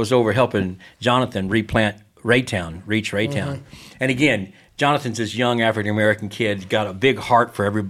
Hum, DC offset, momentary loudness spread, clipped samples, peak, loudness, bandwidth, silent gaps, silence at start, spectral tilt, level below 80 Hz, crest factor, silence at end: none; under 0.1%; 8 LU; under 0.1%; -2 dBFS; -20 LUFS; 14.5 kHz; none; 0 s; -5.5 dB/octave; -50 dBFS; 18 dB; 0 s